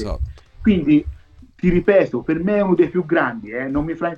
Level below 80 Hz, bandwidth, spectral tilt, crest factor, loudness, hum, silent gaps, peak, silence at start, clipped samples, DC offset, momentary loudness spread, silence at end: -34 dBFS; 7 kHz; -9 dB/octave; 16 dB; -18 LUFS; none; none; -2 dBFS; 0 s; under 0.1%; under 0.1%; 12 LU; 0 s